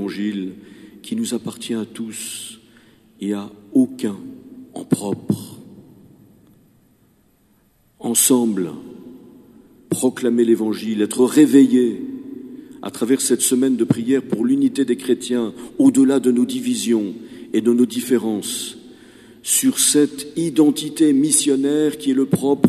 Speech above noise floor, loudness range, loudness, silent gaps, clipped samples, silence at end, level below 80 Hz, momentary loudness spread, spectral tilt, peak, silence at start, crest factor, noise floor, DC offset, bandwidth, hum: 40 dB; 10 LU; -18 LUFS; none; under 0.1%; 0 s; -64 dBFS; 17 LU; -4 dB/octave; 0 dBFS; 0 s; 20 dB; -58 dBFS; under 0.1%; 14 kHz; none